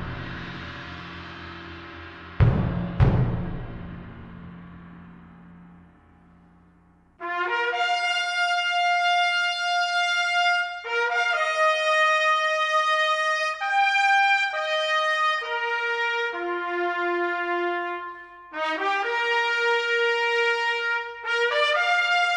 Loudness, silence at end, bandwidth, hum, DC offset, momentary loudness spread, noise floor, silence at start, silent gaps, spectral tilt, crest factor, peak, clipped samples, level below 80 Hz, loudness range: -23 LUFS; 0 s; 11 kHz; 50 Hz at -60 dBFS; under 0.1%; 18 LU; -57 dBFS; 0 s; none; -4.5 dB/octave; 20 dB; -6 dBFS; under 0.1%; -40 dBFS; 8 LU